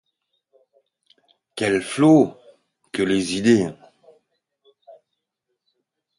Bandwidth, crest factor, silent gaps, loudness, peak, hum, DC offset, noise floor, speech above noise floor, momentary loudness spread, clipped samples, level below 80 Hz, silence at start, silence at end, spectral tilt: 11.5 kHz; 20 dB; none; -19 LUFS; -4 dBFS; none; under 0.1%; -79 dBFS; 61 dB; 14 LU; under 0.1%; -60 dBFS; 1.55 s; 2.45 s; -5.5 dB/octave